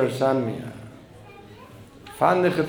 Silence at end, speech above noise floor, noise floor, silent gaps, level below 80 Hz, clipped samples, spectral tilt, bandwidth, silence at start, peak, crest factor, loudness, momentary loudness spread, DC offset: 0 s; 24 dB; -45 dBFS; none; -58 dBFS; under 0.1%; -6.5 dB/octave; over 20 kHz; 0 s; -4 dBFS; 20 dB; -23 LUFS; 25 LU; under 0.1%